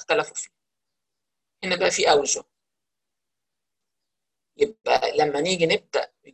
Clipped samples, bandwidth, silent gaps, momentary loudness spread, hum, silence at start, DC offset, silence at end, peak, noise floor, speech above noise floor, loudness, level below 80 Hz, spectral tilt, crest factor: under 0.1%; 11 kHz; none; 12 LU; none; 0 s; under 0.1%; 0.05 s; -6 dBFS; -86 dBFS; 64 dB; -23 LUFS; -64 dBFS; -2.5 dB/octave; 20 dB